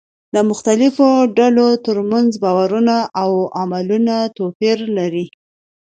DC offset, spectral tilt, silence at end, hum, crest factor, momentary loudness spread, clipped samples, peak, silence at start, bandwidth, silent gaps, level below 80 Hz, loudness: under 0.1%; -6 dB/octave; 0.7 s; none; 16 dB; 9 LU; under 0.1%; 0 dBFS; 0.35 s; 9.2 kHz; 4.55-4.60 s; -64 dBFS; -15 LUFS